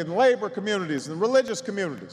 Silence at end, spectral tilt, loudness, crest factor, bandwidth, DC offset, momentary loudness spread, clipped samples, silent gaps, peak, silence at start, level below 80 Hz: 0 s; -4.5 dB/octave; -25 LUFS; 16 dB; 11 kHz; under 0.1%; 9 LU; under 0.1%; none; -10 dBFS; 0 s; -74 dBFS